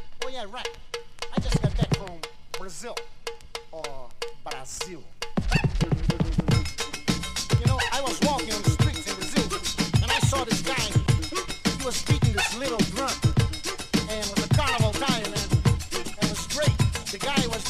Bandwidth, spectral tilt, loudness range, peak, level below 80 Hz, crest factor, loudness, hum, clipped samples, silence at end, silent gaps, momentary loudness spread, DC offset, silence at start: 15.5 kHz; -4.5 dB/octave; 7 LU; -8 dBFS; -36 dBFS; 18 dB; -26 LUFS; none; under 0.1%; 0 s; none; 14 LU; under 0.1%; 0 s